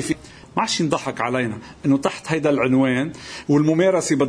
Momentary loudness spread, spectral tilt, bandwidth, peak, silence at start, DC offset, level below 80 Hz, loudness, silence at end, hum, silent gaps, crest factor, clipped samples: 10 LU; -5.5 dB/octave; 11 kHz; -4 dBFS; 0 s; under 0.1%; -54 dBFS; -21 LUFS; 0 s; none; none; 16 dB; under 0.1%